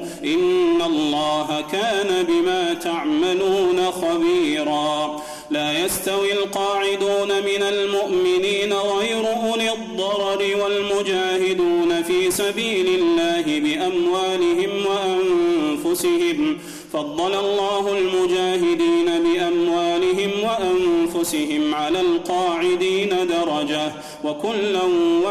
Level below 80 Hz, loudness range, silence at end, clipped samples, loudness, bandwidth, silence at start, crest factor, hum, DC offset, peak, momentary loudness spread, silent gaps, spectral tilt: -56 dBFS; 2 LU; 0 s; under 0.1%; -20 LUFS; 14 kHz; 0 s; 8 dB; none; under 0.1%; -12 dBFS; 4 LU; none; -3.5 dB/octave